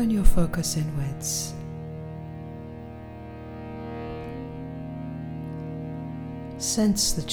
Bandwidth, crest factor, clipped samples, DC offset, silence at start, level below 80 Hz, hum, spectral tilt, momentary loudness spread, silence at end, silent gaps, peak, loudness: 19 kHz; 22 dB; under 0.1%; under 0.1%; 0 s; -32 dBFS; none; -4.5 dB/octave; 15 LU; 0 s; none; -4 dBFS; -30 LUFS